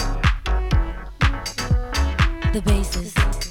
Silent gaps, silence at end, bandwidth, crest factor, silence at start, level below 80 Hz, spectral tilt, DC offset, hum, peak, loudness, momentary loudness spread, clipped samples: none; 0 s; 16.5 kHz; 16 dB; 0 s; -22 dBFS; -5 dB/octave; under 0.1%; none; -4 dBFS; -22 LUFS; 3 LU; under 0.1%